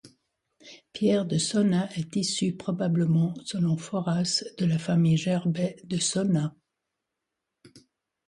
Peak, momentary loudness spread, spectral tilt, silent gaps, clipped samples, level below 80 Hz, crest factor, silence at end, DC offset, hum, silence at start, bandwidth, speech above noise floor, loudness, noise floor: -12 dBFS; 6 LU; -5.5 dB/octave; none; under 0.1%; -66 dBFS; 14 dB; 0.5 s; under 0.1%; none; 0.05 s; 11.5 kHz; 59 dB; -26 LUFS; -84 dBFS